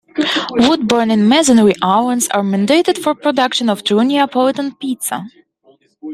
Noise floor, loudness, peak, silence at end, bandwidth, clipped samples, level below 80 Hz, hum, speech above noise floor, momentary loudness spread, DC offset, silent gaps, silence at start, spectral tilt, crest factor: -53 dBFS; -14 LUFS; -2 dBFS; 0 s; 15 kHz; under 0.1%; -54 dBFS; none; 39 dB; 10 LU; under 0.1%; none; 0.15 s; -4 dB/octave; 14 dB